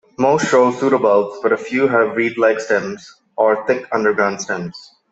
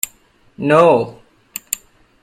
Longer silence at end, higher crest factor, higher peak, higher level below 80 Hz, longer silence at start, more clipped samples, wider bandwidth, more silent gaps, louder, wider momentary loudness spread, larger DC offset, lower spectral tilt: second, 0.3 s vs 1.1 s; about the same, 16 dB vs 18 dB; about the same, -2 dBFS vs 0 dBFS; second, -62 dBFS vs -56 dBFS; second, 0.2 s vs 0.6 s; neither; second, 8.2 kHz vs 16.5 kHz; neither; about the same, -17 LUFS vs -16 LUFS; second, 10 LU vs 19 LU; neither; about the same, -5 dB/octave vs -4.5 dB/octave